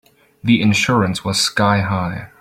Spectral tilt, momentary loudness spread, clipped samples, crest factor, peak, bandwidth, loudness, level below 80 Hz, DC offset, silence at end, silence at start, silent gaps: -4.5 dB/octave; 8 LU; under 0.1%; 16 dB; -2 dBFS; 16 kHz; -16 LUFS; -48 dBFS; under 0.1%; 0.15 s; 0.45 s; none